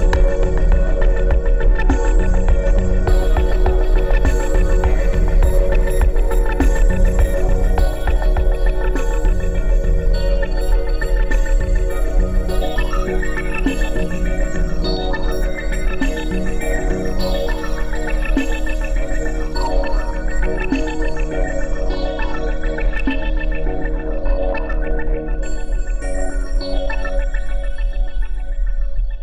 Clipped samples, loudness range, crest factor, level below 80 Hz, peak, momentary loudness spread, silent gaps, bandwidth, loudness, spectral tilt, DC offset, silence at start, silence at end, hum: under 0.1%; 6 LU; 10 dB; -16 dBFS; -6 dBFS; 7 LU; none; 12 kHz; -21 LUFS; -6.5 dB/octave; under 0.1%; 0 s; 0 s; none